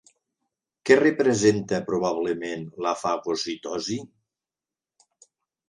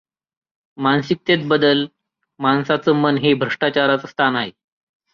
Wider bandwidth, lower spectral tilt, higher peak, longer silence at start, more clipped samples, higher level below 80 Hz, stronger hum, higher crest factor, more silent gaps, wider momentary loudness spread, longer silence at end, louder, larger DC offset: first, 11 kHz vs 7 kHz; second, -4.5 dB/octave vs -7 dB/octave; about the same, -2 dBFS vs -4 dBFS; about the same, 0.85 s vs 0.8 s; neither; about the same, -64 dBFS vs -60 dBFS; neither; first, 24 dB vs 16 dB; neither; first, 12 LU vs 7 LU; first, 1.6 s vs 0.65 s; second, -24 LUFS vs -18 LUFS; neither